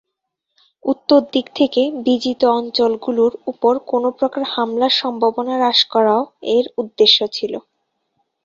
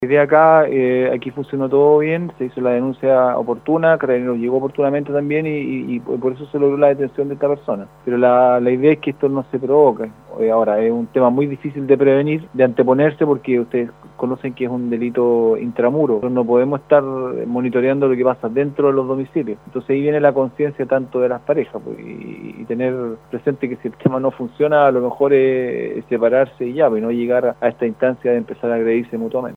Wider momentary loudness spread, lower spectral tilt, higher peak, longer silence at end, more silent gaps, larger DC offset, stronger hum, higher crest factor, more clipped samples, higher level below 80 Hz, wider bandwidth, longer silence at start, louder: about the same, 8 LU vs 10 LU; second, -4 dB/octave vs -9.5 dB/octave; about the same, 0 dBFS vs 0 dBFS; first, 0.85 s vs 0 s; neither; neither; neither; about the same, 18 dB vs 16 dB; neither; about the same, -62 dBFS vs -58 dBFS; first, 7.4 kHz vs 4.1 kHz; first, 0.85 s vs 0 s; about the same, -17 LUFS vs -17 LUFS